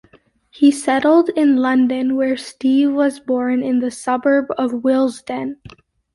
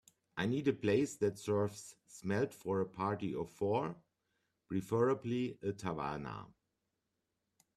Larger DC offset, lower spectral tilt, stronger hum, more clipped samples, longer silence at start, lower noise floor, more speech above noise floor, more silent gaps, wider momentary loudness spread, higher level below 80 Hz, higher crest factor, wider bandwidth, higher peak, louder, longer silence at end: neither; second, -4.5 dB/octave vs -6.5 dB/octave; neither; neither; first, 0.6 s vs 0.35 s; second, -53 dBFS vs -86 dBFS; second, 36 dB vs 50 dB; neither; second, 7 LU vs 13 LU; first, -60 dBFS vs -70 dBFS; about the same, 14 dB vs 18 dB; second, 11.5 kHz vs 14 kHz; first, -2 dBFS vs -20 dBFS; first, -17 LUFS vs -37 LUFS; second, 0.6 s vs 1.3 s